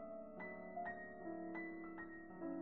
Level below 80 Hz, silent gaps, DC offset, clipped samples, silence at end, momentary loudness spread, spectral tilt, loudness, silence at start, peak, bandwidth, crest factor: -78 dBFS; none; under 0.1%; under 0.1%; 0 s; 4 LU; -7 dB/octave; -50 LUFS; 0 s; -36 dBFS; 4.2 kHz; 14 dB